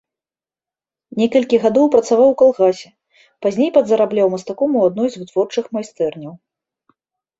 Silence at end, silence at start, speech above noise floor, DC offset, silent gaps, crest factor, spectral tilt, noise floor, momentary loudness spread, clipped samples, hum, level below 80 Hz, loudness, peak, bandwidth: 1.05 s; 1.15 s; over 75 dB; under 0.1%; none; 16 dB; -6 dB/octave; under -90 dBFS; 10 LU; under 0.1%; none; -62 dBFS; -16 LUFS; 0 dBFS; 8 kHz